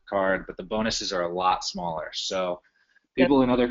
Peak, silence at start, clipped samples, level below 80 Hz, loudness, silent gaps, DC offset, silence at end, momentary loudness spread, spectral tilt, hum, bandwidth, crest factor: -6 dBFS; 0.1 s; under 0.1%; -50 dBFS; -26 LUFS; none; under 0.1%; 0 s; 11 LU; -3 dB/octave; none; 7.6 kHz; 18 dB